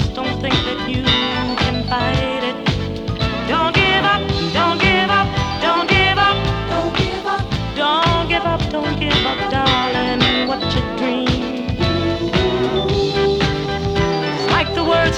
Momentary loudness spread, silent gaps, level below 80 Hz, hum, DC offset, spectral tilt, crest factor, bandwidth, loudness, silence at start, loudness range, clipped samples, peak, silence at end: 7 LU; none; -30 dBFS; none; under 0.1%; -5.5 dB/octave; 16 dB; 12.5 kHz; -17 LUFS; 0 s; 3 LU; under 0.1%; 0 dBFS; 0 s